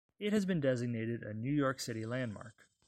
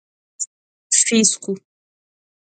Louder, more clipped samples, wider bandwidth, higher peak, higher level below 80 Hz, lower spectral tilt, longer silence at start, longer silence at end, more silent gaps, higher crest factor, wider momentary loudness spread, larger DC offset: second, -36 LUFS vs -16 LUFS; neither; first, 16 kHz vs 9.6 kHz; second, -20 dBFS vs 0 dBFS; about the same, -68 dBFS vs -70 dBFS; first, -6 dB/octave vs -2 dB/octave; second, 0.2 s vs 0.4 s; second, 0.35 s vs 0.95 s; second, none vs 0.47-0.90 s; second, 16 dB vs 22 dB; second, 8 LU vs 15 LU; neither